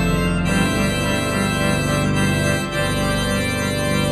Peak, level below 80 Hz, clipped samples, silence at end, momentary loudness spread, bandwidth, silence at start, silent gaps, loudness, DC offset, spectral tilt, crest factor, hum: -6 dBFS; -32 dBFS; under 0.1%; 0 s; 2 LU; 13.5 kHz; 0 s; none; -19 LUFS; under 0.1%; -5 dB/octave; 14 dB; 50 Hz at -35 dBFS